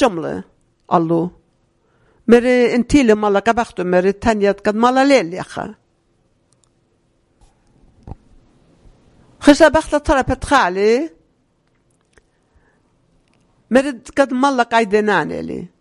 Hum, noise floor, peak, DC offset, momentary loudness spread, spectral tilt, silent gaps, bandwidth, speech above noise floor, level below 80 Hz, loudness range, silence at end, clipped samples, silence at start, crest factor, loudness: none; -61 dBFS; 0 dBFS; under 0.1%; 14 LU; -5 dB/octave; none; 11.5 kHz; 47 dB; -40 dBFS; 8 LU; 0.15 s; 0.1%; 0 s; 18 dB; -15 LUFS